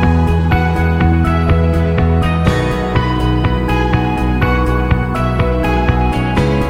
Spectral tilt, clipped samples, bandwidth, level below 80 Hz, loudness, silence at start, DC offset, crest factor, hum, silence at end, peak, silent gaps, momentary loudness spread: -7.5 dB/octave; under 0.1%; 14.5 kHz; -18 dBFS; -14 LUFS; 0 s; under 0.1%; 12 dB; none; 0 s; 0 dBFS; none; 3 LU